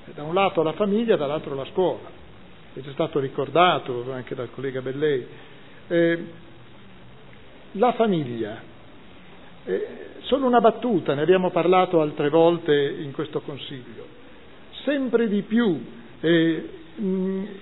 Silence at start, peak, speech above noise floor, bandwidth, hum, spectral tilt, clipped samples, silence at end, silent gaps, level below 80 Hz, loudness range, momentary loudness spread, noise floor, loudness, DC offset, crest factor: 0.05 s; -4 dBFS; 25 dB; 4.1 kHz; none; -10 dB/octave; under 0.1%; 0 s; none; -60 dBFS; 7 LU; 17 LU; -47 dBFS; -23 LUFS; 0.5%; 20 dB